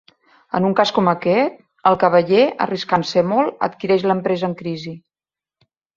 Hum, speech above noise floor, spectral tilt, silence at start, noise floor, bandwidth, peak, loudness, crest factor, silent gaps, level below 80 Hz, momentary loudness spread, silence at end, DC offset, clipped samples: none; over 73 dB; -6.5 dB/octave; 0.55 s; under -90 dBFS; 7.6 kHz; -2 dBFS; -18 LUFS; 18 dB; none; -60 dBFS; 10 LU; 1 s; under 0.1%; under 0.1%